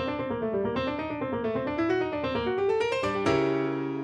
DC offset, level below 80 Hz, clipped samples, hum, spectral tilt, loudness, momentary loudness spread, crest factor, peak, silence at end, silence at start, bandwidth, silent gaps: under 0.1%; -54 dBFS; under 0.1%; none; -6.5 dB/octave; -28 LUFS; 5 LU; 16 dB; -12 dBFS; 0 s; 0 s; 9.8 kHz; none